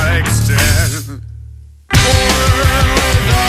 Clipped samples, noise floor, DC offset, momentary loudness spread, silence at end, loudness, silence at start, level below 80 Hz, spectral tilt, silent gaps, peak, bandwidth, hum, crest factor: under 0.1%; -34 dBFS; under 0.1%; 14 LU; 0 s; -12 LUFS; 0 s; -20 dBFS; -4 dB/octave; none; 0 dBFS; 15.5 kHz; none; 12 dB